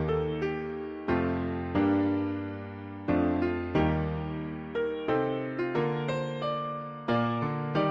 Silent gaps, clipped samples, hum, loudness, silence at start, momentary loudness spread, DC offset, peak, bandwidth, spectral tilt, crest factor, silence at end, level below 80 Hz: none; under 0.1%; none; -30 LUFS; 0 s; 9 LU; under 0.1%; -14 dBFS; 7.4 kHz; -8.5 dB/octave; 16 dB; 0 s; -48 dBFS